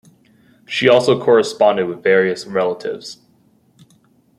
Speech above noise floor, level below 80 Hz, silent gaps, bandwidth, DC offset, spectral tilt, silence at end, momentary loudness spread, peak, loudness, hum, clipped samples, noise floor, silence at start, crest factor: 40 dB; -62 dBFS; none; 12 kHz; under 0.1%; -5 dB/octave; 1.25 s; 13 LU; -2 dBFS; -16 LUFS; none; under 0.1%; -56 dBFS; 0.7 s; 16 dB